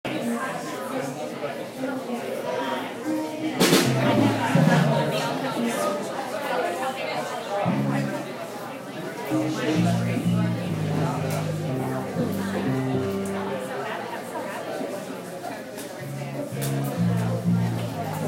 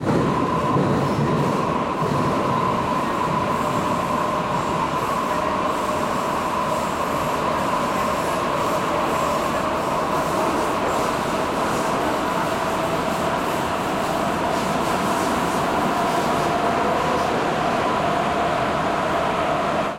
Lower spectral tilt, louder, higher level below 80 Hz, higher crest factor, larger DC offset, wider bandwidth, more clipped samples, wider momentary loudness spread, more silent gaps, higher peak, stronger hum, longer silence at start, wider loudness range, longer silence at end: about the same, -5.5 dB/octave vs -5 dB/octave; second, -26 LUFS vs -21 LUFS; second, -60 dBFS vs -46 dBFS; first, 20 dB vs 14 dB; neither; about the same, 16 kHz vs 16.5 kHz; neither; first, 12 LU vs 2 LU; neither; first, -4 dBFS vs -8 dBFS; neither; about the same, 0.05 s vs 0 s; first, 8 LU vs 1 LU; about the same, 0 s vs 0 s